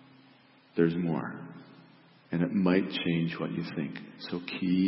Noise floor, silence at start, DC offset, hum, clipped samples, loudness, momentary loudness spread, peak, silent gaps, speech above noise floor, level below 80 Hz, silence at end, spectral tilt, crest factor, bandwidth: -59 dBFS; 0.75 s; under 0.1%; none; under 0.1%; -31 LUFS; 14 LU; -12 dBFS; none; 30 dB; -70 dBFS; 0 s; -10.5 dB/octave; 20 dB; 5.8 kHz